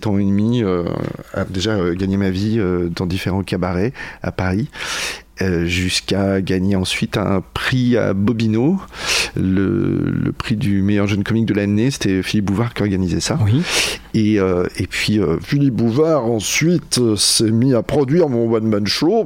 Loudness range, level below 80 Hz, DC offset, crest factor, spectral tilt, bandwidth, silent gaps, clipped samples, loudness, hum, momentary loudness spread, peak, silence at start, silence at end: 4 LU; -42 dBFS; under 0.1%; 16 dB; -5 dB/octave; 16.5 kHz; none; under 0.1%; -18 LUFS; none; 6 LU; -2 dBFS; 0 s; 0 s